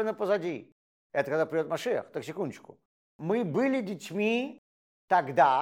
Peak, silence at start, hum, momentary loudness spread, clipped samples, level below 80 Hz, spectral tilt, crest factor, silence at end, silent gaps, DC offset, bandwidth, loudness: -10 dBFS; 0 s; none; 11 LU; under 0.1%; -82 dBFS; -6 dB/octave; 20 dB; 0 s; 0.72-1.10 s, 2.85-3.19 s, 4.58-5.08 s; under 0.1%; 16.5 kHz; -30 LUFS